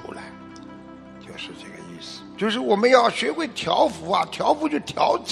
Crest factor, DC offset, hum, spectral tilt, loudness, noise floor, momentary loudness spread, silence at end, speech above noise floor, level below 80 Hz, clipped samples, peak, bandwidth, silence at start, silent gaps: 22 dB; under 0.1%; none; -4 dB/octave; -21 LUFS; -42 dBFS; 24 LU; 0 s; 20 dB; -60 dBFS; under 0.1%; 0 dBFS; 12.5 kHz; 0 s; none